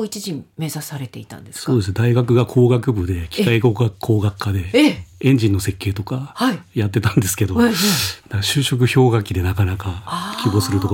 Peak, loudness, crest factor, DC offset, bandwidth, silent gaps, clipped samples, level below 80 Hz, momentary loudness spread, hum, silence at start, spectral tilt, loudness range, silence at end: -2 dBFS; -18 LUFS; 16 dB; under 0.1%; 17 kHz; none; under 0.1%; -48 dBFS; 12 LU; none; 0 s; -5.5 dB/octave; 2 LU; 0 s